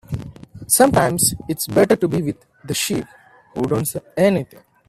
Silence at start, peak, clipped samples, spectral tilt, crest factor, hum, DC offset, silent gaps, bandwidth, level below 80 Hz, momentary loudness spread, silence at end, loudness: 0.1 s; 0 dBFS; under 0.1%; -4 dB/octave; 20 dB; none; under 0.1%; none; 16 kHz; -48 dBFS; 20 LU; 0.45 s; -18 LUFS